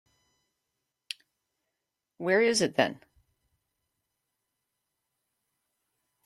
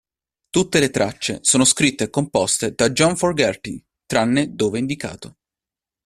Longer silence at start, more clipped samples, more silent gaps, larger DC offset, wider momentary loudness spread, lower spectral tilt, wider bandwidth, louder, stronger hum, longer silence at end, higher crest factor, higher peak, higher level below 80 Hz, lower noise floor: first, 2.2 s vs 0.55 s; neither; neither; neither; first, 18 LU vs 14 LU; about the same, -3.5 dB/octave vs -3.5 dB/octave; second, 13.5 kHz vs 15 kHz; second, -26 LUFS vs -19 LUFS; neither; first, 3.3 s vs 0.8 s; first, 26 dB vs 20 dB; second, -10 dBFS vs -2 dBFS; second, -76 dBFS vs -52 dBFS; about the same, -86 dBFS vs -89 dBFS